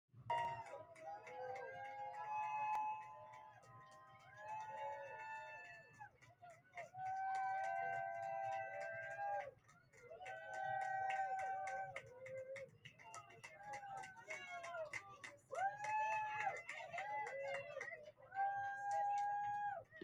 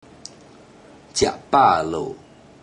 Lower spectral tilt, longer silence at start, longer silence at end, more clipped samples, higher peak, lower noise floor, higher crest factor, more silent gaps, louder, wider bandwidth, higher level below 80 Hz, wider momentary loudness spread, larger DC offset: about the same, -3 dB/octave vs -3.5 dB/octave; second, 0.15 s vs 1.15 s; second, 0 s vs 0.45 s; neither; second, -28 dBFS vs -4 dBFS; first, -68 dBFS vs -47 dBFS; about the same, 18 dB vs 20 dB; neither; second, -46 LUFS vs -19 LUFS; about the same, 11.5 kHz vs 10.5 kHz; second, -86 dBFS vs -52 dBFS; second, 16 LU vs 25 LU; neither